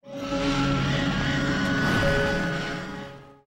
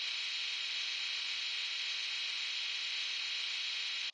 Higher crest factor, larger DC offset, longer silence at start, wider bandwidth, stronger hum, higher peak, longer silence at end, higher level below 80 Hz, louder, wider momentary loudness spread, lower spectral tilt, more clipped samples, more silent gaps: about the same, 14 dB vs 14 dB; neither; about the same, 0.05 s vs 0 s; first, 16 kHz vs 9 kHz; neither; first, -12 dBFS vs -26 dBFS; first, 0.15 s vs 0 s; first, -38 dBFS vs under -90 dBFS; first, -25 LUFS vs -35 LUFS; first, 11 LU vs 0 LU; first, -5.5 dB/octave vs 4.5 dB/octave; neither; neither